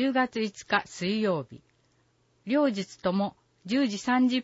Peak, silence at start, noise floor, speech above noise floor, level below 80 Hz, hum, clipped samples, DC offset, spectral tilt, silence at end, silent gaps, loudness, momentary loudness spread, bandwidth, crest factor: -8 dBFS; 0 s; -68 dBFS; 41 dB; -68 dBFS; none; under 0.1%; under 0.1%; -5 dB/octave; 0 s; none; -28 LUFS; 8 LU; 8 kHz; 20 dB